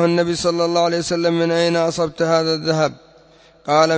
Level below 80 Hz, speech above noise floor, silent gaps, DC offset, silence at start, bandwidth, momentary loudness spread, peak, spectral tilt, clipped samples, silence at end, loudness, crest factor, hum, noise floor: -54 dBFS; 32 dB; none; under 0.1%; 0 s; 8 kHz; 3 LU; -2 dBFS; -5 dB/octave; under 0.1%; 0 s; -18 LUFS; 16 dB; none; -49 dBFS